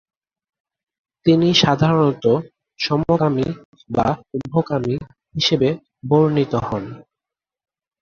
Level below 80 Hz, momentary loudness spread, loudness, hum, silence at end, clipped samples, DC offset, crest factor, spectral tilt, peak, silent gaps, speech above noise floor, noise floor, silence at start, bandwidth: -50 dBFS; 12 LU; -19 LUFS; none; 1 s; under 0.1%; under 0.1%; 18 dB; -6.5 dB/octave; -2 dBFS; 3.65-3.73 s; 70 dB; -88 dBFS; 1.25 s; 7 kHz